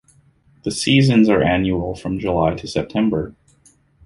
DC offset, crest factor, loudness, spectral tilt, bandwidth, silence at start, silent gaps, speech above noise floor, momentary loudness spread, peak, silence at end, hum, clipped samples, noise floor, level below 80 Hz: under 0.1%; 16 dB; -18 LUFS; -6 dB/octave; 11.5 kHz; 0.65 s; none; 38 dB; 12 LU; -2 dBFS; 0.75 s; none; under 0.1%; -55 dBFS; -40 dBFS